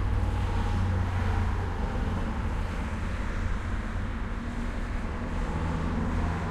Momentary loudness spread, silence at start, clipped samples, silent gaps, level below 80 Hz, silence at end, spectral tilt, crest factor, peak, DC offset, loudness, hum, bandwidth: 6 LU; 0 s; under 0.1%; none; -32 dBFS; 0 s; -7 dB/octave; 12 dB; -16 dBFS; under 0.1%; -31 LUFS; none; 11 kHz